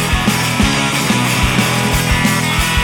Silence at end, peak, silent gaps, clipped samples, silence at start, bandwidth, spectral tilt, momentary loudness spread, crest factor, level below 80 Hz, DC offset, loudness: 0 s; -2 dBFS; none; under 0.1%; 0 s; 19 kHz; -3.5 dB/octave; 1 LU; 12 dB; -24 dBFS; under 0.1%; -13 LUFS